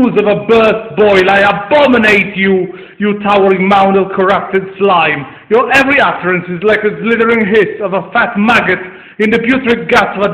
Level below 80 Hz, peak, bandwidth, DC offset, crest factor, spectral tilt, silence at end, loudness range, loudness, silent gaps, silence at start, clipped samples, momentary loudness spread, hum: -44 dBFS; 0 dBFS; 12.5 kHz; under 0.1%; 10 dB; -6 dB/octave; 0 s; 2 LU; -10 LUFS; none; 0 s; 0.3%; 7 LU; none